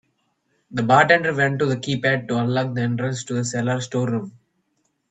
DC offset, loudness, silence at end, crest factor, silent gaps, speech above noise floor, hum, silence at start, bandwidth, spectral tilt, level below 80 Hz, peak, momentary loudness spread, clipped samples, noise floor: under 0.1%; -21 LUFS; 0.8 s; 22 dB; none; 50 dB; none; 0.7 s; 9.2 kHz; -5.5 dB/octave; -62 dBFS; 0 dBFS; 10 LU; under 0.1%; -70 dBFS